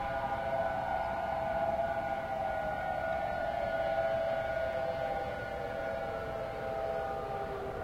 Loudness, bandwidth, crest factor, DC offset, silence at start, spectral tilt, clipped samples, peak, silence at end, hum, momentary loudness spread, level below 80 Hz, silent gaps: -35 LUFS; 16 kHz; 12 dB; under 0.1%; 0 s; -6 dB/octave; under 0.1%; -22 dBFS; 0 s; none; 5 LU; -52 dBFS; none